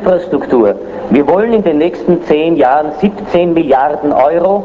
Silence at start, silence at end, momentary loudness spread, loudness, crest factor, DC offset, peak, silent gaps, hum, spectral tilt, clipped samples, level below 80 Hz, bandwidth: 0 s; 0 s; 4 LU; -11 LUFS; 10 dB; under 0.1%; 0 dBFS; none; none; -8.5 dB/octave; under 0.1%; -42 dBFS; 7.4 kHz